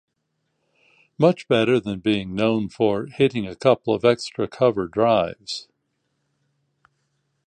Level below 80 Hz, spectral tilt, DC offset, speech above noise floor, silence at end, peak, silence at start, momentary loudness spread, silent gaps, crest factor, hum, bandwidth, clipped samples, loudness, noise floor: -56 dBFS; -6.5 dB/octave; under 0.1%; 54 dB; 1.85 s; -4 dBFS; 1.2 s; 7 LU; none; 20 dB; none; 9.8 kHz; under 0.1%; -21 LUFS; -74 dBFS